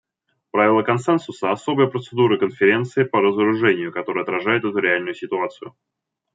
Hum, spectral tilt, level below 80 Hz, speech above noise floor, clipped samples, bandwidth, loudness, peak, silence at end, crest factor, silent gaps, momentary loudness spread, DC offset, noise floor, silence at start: none; -6.5 dB/octave; -68 dBFS; 46 dB; under 0.1%; 7.8 kHz; -20 LUFS; -2 dBFS; 0.65 s; 18 dB; none; 8 LU; under 0.1%; -65 dBFS; 0.55 s